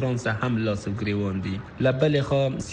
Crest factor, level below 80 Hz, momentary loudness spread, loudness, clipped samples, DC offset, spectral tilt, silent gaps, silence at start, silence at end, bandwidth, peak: 16 dB; -50 dBFS; 6 LU; -25 LUFS; under 0.1%; under 0.1%; -6.5 dB/octave; none; 0 s; 0 s; 9.4 kHz; -8 dBFS